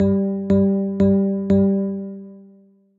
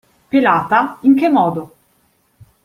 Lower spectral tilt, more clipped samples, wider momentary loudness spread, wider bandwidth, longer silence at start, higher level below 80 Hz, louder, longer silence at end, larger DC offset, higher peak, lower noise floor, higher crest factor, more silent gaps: first, -11.5 dB/octave vs -7.5 dB/octave; neither; first, 12 LU vs 6 LU; second, 4.3 kHz vs 5.6 kHz; second, 0 s vs 0.35 s; first, -48 dBFS vs -58 dBFS; second, -19 LUFS vs -14 LUFS; second, 0.55 s vs 1 s; neither; second, -6 dBFS vs -2 dBFS; second, -52 dBFS vs -59 dBFS; about the same, 12 dB vs 16 dB; neither